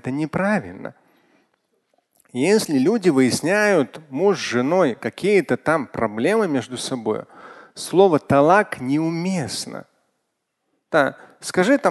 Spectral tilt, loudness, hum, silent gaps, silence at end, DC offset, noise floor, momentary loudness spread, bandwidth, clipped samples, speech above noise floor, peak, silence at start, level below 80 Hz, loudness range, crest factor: -5 dB/octave; -20 LUFS; none; none; 0 s; under 0.1%; -75 dBFS; 13 LU; 12.5 kHz; under 0.1%; 56 dB; -2 dBFS; 0.05 s; -58 dBFS; 3 LU; 20 dB